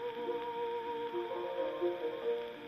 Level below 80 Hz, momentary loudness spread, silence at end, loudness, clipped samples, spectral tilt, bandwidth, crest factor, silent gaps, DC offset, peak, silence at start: -76 dBFS; 3 LU; 0 s; -38 LUFS; under 0.1%; -6 dB/octave; 13.5 kHz; 12 dB; none; under 0.1%; -24 dBFS; 0 s